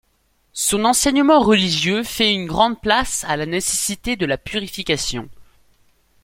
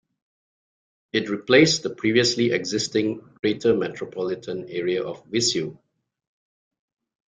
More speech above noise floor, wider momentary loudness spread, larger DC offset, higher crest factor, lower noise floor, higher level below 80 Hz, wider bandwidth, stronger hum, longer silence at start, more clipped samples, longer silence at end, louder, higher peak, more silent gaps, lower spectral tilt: second, 44 dB vs over 67 dB; about the same, 10 LU vs 11 LU; neither; second, 18 dB vs 24 dB; second, -63 dBFS vs under -90 dBFS; first, -42 dBFS vs -62 dBFS; first, 16.5 kHz vs 9.6 kHz; neither; second, 0.55 s vs 1.15 s; neither; second, 0.8 s vs 1.55 s; first, -18 LUFS vs -23 LUFS; about the same, -2 dBFS vs -2 dBFS; second, none vs 3.39-3.43 s; about the same, -3 dB/octave vs -4 dB/octave